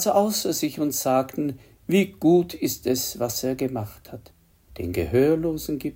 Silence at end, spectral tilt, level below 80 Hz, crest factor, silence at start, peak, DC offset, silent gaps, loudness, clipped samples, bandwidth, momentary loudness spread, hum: 0.05 s; -5 dB/octave; -50 dBFS; 16 dB; 0 s; -6 dBFS; under 0.1%; none; -24 LUFS; under 0.1%; 16.5 kHz; 14 LU; none